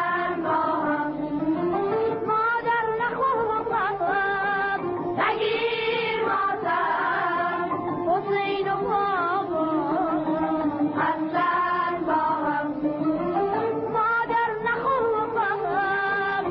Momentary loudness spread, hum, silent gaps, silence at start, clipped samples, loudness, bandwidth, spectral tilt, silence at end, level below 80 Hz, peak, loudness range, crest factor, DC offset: 3 LU; none; none; 0 s; under 0.1%; -24 LUFS; 5.6 kHz; -3 dB/octave; 0 s; -58 dBFS; -12 dBFS; 1 LU; 12 dB; under 0.1%